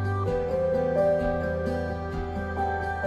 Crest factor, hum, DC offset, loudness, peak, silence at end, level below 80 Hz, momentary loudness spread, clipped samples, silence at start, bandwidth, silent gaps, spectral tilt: 14 dB; none; under 0.1%; -27 LUFS; -12 dBFS; 0 s; -40 dBFS; 8 LU; under 0.1%; 0 s; 11.5 kHz; none; -8.5 dB/octave